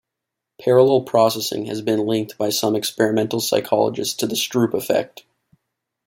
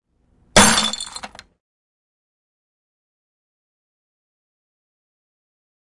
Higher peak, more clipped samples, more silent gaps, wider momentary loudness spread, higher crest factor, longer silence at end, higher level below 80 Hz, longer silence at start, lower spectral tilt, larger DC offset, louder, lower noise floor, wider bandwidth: about the same, -2 dBFS vs 0 dBFS; neither; neither; second, 8 LU vs 19 LU; second, 18 dB vs 24 dB; second, 1 s vs 4.7 s; second, -64 dBFS vs -44 dBFS; about the same, 0.6 s vs 0.55 s; first, -4.5 dB/octave vs -2 dB/octave; neither; second, -19 LUFS vs -14 LUFS; first, -82 dBFS vs -60 dBFS; first, 16.5 kHz vs 11.5 kHz